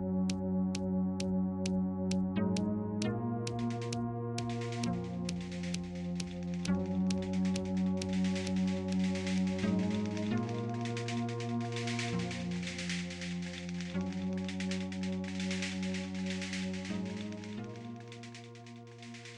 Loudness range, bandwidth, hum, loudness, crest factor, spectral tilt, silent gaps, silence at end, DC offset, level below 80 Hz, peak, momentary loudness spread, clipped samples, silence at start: 4 LU; 11 kHz; none; -36 LUFS; 18 dB; -6 dB/octave; none; 0 s; under 0.1%; -62 dBFS; -18 dBFS; 7 LU; under 0.1%; 0 s